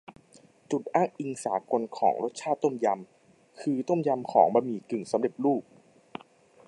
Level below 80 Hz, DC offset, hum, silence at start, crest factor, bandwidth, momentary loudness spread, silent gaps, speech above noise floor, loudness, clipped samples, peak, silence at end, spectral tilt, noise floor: -80 dBFS; under 0.1%; none; 0.1 s; 22 dB; 11.5 kHz; 12 LU; none; 31 dB; -28 LUFS; under 0.1%; -6 dBFS; 1.05 s; -6.5 dB/octave; -58 dBFS